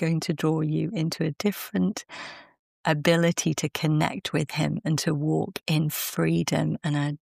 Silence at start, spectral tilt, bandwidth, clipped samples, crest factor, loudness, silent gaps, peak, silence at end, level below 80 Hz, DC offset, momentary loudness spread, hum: 0 s; -5.5 dB/octave; 15.5 kHz; under 0.1%; 18 dB; -26 LUFS; 2.59-2.84 s; -8 dBFS; 0.2 s; -62 dBFS; under 0.1%; 6 LU; none